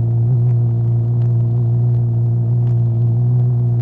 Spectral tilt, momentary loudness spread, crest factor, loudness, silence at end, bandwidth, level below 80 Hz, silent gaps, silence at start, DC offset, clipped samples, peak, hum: -13 dB/octave; 1 LU; 6 dB; -16 LUFS; 0 s; 1.3 kHz; -42 dBFS; none; 0 s; under 0.1%; under 0.1%; -8 dBFS; none